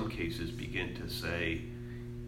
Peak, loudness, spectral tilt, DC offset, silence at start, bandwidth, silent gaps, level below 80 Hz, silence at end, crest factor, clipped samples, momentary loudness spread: -20 dBFS; -37 LUFS; -5.5 dB/octave; under 0.1%; 0 s; 16 kHz; none; -48 dBFS; 0 s; 18 dB; under 0.1%; 10 LU